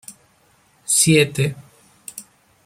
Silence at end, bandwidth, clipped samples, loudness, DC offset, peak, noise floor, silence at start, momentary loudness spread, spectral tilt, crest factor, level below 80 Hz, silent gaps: 0.45 s; 16.5 kHz; under 0.1%; -16 LUFS; under 0.1%; -2 dBFS; -58 dBFS; 0.1 s; 24 LU; -3.5 dB/octave; 20 dB; -58 dBFS; none